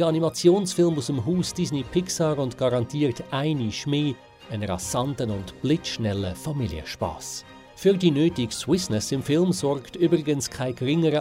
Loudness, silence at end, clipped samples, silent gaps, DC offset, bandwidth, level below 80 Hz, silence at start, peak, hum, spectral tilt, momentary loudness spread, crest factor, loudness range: -25 LUFS; 0 s; under 0.1%; none; under 0.1%; 16 kHz; -52 dBFS; 0 s; -6 dBFS; none; -5.5 dB/octave; 9 LU; 18 dB; 4 LU